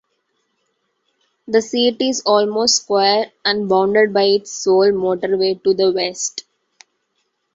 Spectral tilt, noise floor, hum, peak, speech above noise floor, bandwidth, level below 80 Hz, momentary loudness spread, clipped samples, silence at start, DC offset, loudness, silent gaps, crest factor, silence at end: -3 dB/octave; -70 dBFS; none; -2 dBFS; 53 dB; 8 kHz; -62 dBFS; 5 LU; under 0.1%; 1.5 s; under 0.1%; -16 LUFS; none; 16 dB; 1.15 s